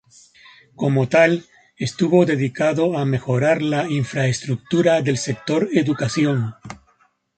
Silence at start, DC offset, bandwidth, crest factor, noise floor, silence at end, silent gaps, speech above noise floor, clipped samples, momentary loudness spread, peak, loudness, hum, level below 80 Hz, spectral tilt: 0.8 s; under 0.1%; 9.2 kHz; 18 dB; -61 dBFS; 0.6 s; none; 42 dB; under 0.1%; 9 LU; -2 dBFS; -19 LUFS; none; -56 dBFS; -6 dB/octave